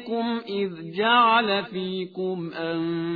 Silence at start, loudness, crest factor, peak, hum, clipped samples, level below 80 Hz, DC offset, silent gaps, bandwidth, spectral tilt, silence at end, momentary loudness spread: 0 s; -24 LUFS; 18 dB; -6 dBFS; none; under 0.1%; -70 dBFS; under 0.1%; none; 5 kHz; -8 dB/octave; 0 s; 12 LU